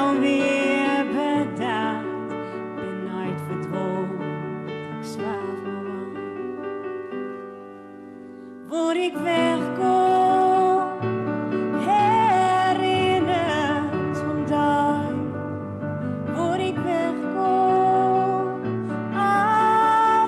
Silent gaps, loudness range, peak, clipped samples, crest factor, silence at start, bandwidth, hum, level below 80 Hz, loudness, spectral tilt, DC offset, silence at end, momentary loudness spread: none; 10 LU; -10 dBFS; under 0.1%; 12 dB; 0 s; 12.5 kHz; none; -64 dBFS; -23 LUFS; -6 dB/octave; under 0.1%; 0 s; 14 LU